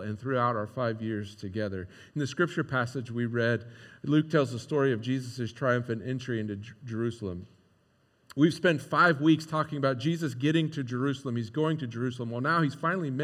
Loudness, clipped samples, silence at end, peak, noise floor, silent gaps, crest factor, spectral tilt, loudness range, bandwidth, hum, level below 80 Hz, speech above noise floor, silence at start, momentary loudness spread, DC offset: -29 LUFS; under 0.1%; 0 s; -10 dBFS; -67 dBFS; none; 20 dB; -6.5 dB/octave; 5 LU; 13 kHz; none; -72 dBFS; 39 dB; 0 s; 11 LU; under 0.1%